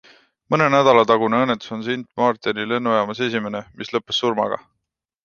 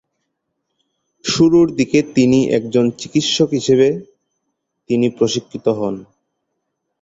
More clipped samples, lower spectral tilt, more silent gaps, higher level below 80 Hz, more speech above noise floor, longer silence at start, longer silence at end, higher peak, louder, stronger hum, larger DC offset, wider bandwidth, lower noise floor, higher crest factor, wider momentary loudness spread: neither; about the same, -5.5 dB/octave vs -5 dB/octave; neither; second, -62 dBFS vs -54 dBFS; about the same, 60 dB vs 59 dB; second, 0.5 s vs 1.25 s; second, 0.65 s vs 1 s; about the same, -2 dBFS vs -2 dBFS; second, -19 LUFS vs -16 LUFS; neither; neither; second, 7 kHz vs 8 kHz; first, -79 dBFS vs -74 dBFS; about the same, 18 dB vs 16 dB; first, 12 LU vs 9 LU